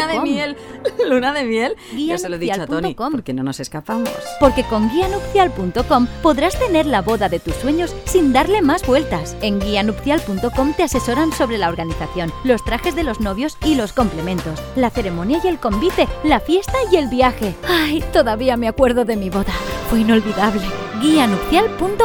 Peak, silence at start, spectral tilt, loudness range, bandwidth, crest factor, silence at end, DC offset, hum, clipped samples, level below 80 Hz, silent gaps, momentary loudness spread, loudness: 0 dBFS; 0 s; -5 dB/octave; 3 LU; over 20 kHz; 18 dB; 0 s; under 0.1%; none; under 0.1%; -32 dBFS; none; 8 LU; -18 LUFS